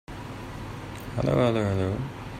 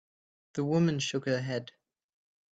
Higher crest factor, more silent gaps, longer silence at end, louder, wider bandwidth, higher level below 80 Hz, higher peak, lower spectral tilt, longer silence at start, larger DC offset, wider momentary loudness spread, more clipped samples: about the same, 18 dB vs 16 dB; neither; second, 0 s vs 0.85 s; first, -28 LUFS vs -31 LUFS; first, 16 kHz vs 8 kHz; first, -46 dBFS vs -70 dBFS; first, -10 dBFS vs -16 dBFS; first, -7.5 dB/octave vs -5.5 dB/octave; second, 0.1 s vs 0.55 s; neither; first, 15 LU vs 12 LU; neither